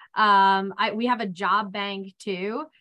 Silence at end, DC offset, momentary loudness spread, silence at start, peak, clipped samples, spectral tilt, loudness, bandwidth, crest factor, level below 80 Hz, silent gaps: 0.15 s; under 0.1%; 13 LU; 0.15 s; -8 dBFS; under 0.1%; -5 dB/octave; -23 LUFS; 10.5 kHz; 16 dB; -76 dBFS; none